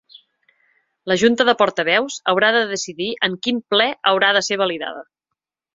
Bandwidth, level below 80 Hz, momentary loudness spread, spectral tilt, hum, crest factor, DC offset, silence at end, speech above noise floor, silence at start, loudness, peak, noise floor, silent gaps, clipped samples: 7.8 kHz; -64 dBFS; 10 LU; -3 dB/octave; none; 18 dB; under 0.1%; 0.75 s; 63 dB; 0.15 s; -18 LUFS; -2 dBFS; -82 dBFS; none; under 0.1%